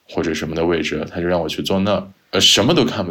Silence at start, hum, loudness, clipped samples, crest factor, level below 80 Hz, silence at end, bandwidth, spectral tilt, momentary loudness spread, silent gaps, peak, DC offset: 0.1 s; none; -17 LUFS; under 0.1%; 16 dB; -44 dBFS; 0 s; 18 kHz; -3.5 dB/octave; 11 LU; none; -2 dBFS; under 0.1%